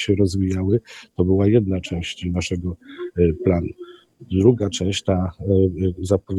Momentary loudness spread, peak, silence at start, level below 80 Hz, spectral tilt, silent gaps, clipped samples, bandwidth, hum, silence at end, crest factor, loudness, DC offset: 11 LU; -2 dBFS; 0 s; -42 dBFS; -7 dB/octave; none; under 0.1%; 11.5 kHz; none; 0 s; 18 dB; -21 LUFS; under 0.1%